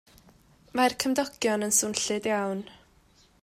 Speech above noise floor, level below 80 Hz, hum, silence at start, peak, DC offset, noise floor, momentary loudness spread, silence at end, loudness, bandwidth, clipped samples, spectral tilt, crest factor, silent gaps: 34 dB; -64 dBFS; none; 0.75 s; -6 dBFS; under 0.1%; -61 dBFS; 11 LU; 0.7 s; -27 LUFS; 16 kHz; under 0.1%; -2.5 dB/octave; 22 dB; none